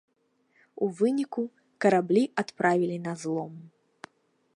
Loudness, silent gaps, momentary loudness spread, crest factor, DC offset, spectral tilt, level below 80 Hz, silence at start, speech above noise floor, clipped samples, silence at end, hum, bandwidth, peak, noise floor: -27 LUFS; none; 10 LU; 20 dB; under 0.1%; -6.5 dB/octave; -78 dBFS; 0.8 s; 44 dB; under 0.1%; 0.9 s; none; 11.5 kHz; -8 dBFS; -70 dBFS